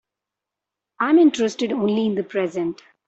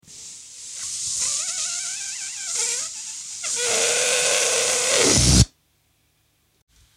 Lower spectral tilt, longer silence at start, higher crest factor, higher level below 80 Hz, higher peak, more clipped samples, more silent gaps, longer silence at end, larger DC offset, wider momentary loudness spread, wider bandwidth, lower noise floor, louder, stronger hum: first, -5.5 dB/octave vs -2 dB/octave; first, 1 s vs 0.1 s; second, 16 dB vs 22 dB; second, -68 dBFS vs -36 dBFS; second, -6 dBFS vs -2 dBFS; neither; neither; second, 0.35 s vs 1.5 s; neither; second, 10 LU vs 15 LU; second, 8 kHz vs 16.5 kHz; first, -86 dBFS vs -65 dBFS; about the same, -20 LUFS vs -20 LUFS; neither